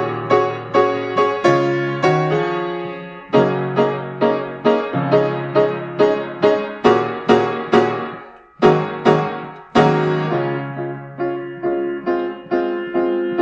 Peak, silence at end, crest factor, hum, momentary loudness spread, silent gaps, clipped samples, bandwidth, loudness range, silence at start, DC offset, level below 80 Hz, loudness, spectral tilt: 0 dBFS; 0 s; 18 dB; none; 9 LU; none; under 0.1%; 7.8 kHz; 3 LU; 0 s; under 0.1%; -56 dBFS; -18 LUFS; -7 dB/octave